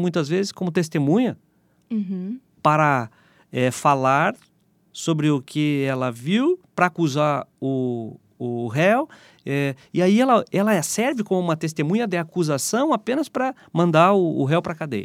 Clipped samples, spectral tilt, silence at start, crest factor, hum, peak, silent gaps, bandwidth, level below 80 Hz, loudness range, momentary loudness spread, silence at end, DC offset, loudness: under 0.1%; -5.5 dB/octave; 0 s; 20 dB; none; -2 dBFS; none; 16 kHz; -70 dBFS; 2 LU; 11 LU; 0 s; under 0.1%; -21 LUFS